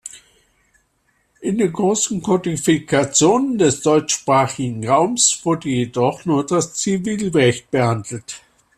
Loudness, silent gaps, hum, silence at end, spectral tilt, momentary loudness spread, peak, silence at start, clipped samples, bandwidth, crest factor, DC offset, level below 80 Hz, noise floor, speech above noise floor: -18 LUFS; none; none; 0.4 s; -4 dB/octave; 10 LU; -2 dBFS; 0.05 s; under 0.1%; 14 kHz; 16 dB; under 0.1%; -54 dBFS; -64 dBFS; 47 dB